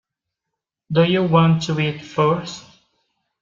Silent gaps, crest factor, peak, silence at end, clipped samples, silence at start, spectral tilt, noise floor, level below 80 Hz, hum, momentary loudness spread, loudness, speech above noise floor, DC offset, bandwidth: none; 18 dB; -2 dBFS; 0.8 s; under 0.1%; 0.9 s; -6.5 dB/octave; -83 dBFS; -56 dBFS; none; 10 LU; -18 LUFS; 65 dB; under 0.1%; 7.4 kHz